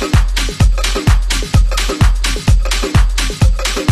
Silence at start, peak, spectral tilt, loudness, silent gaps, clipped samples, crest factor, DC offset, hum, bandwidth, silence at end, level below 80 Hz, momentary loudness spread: 0 s; 0 dBFS; -4.5 dB/octave; -14 LUFS; none; under 0.1%; 12 dB; under 0.1%; none; 13.5 kHz; 0 s; -14 dBFS; 2 LU